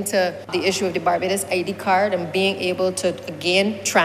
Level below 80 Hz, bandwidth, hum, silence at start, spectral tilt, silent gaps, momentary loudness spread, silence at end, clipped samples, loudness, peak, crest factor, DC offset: -60 dBFS; 15.5 kHz; none; 0 s; -3.5 dB/octave; none; 4 LU; 0 s; under 0.1%; -21 LUFS; -4 dBFS; 18 dB; under 0.1%